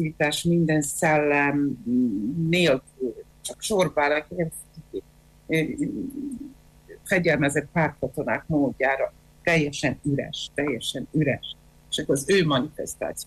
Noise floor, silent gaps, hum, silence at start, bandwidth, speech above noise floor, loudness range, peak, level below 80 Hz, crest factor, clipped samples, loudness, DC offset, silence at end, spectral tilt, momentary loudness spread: -50 dBFS; none; none; 0 s; 14.5 kHz; 26 dB; 4 LU; -10 dBFS; -52 dBFS; 14 dB; under 0.1%; -24 LUFS; under 0.1%; 0 s; -5 dB/octave; 14 LU